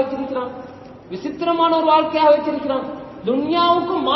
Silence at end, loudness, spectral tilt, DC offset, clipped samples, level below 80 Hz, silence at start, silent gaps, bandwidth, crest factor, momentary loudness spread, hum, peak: 0 s; -18 LUFS; -7 dB/octave; under 0.1%; under 0.1%; -56 dBFS; 0 s; none; 6 kHz; 16 dB; 16 LU; none; -2 dBFS